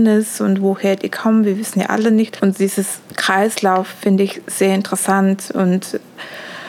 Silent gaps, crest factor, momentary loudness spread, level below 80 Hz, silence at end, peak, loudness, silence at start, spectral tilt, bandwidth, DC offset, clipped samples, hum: none; 16 dB; 6 LU; -70 dBFS; 0 s; 0 dBFS; -17 LUFS; 0 s; -5 dB/octave; 16.5 kHz; under 0.1%; under 0.1%; none